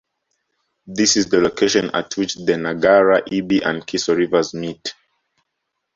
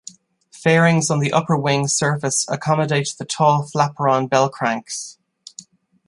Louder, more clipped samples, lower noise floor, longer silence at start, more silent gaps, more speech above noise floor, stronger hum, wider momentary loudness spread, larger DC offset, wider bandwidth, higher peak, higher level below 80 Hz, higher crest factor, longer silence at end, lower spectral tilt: about the same, -18 LUFS vs -18 LUFS; neither; first, -76 dBFS vs -49 dBFS; first, 0.85 s vs 0.55 s; neither; first, 59 dB vs 31 dB; neither; about the same, 12 LU vs 14 LU; neither; second, 7.8 kHz vs 11.5 kHz; about the same, -2 dBFS vs -2 dBFS; first, -56 dBFS vs -62 dBFS; about the same, 18 dB vs 18 dB; first, 1.05 s vs 0.45 s; about the same, -3.5 dB/octave vs -4.5 dB/octave